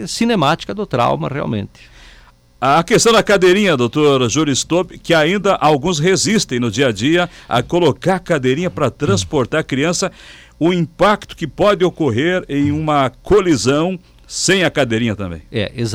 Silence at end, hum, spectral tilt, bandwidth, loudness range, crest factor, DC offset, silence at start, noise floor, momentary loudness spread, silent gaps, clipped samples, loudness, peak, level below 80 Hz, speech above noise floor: 0 s; none; -4.5 dB/octave; 16 kHz; 4 LU; 10 dB; under 0.1%; 0 s; -46 dBFS; 9 LU; none; under 0.1%; -15 LUFS; -4 dBFS; -42 dBFS; 30 dB